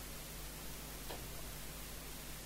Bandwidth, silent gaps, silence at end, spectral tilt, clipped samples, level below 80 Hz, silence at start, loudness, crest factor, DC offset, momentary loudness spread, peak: 16 kHz; none; 0 s; -3 dB/octave; under 0.1%; -54 dBFS; 0 s; -47 LUFS; 18 dB; under 0.1%; 1 LU; -30 dBFS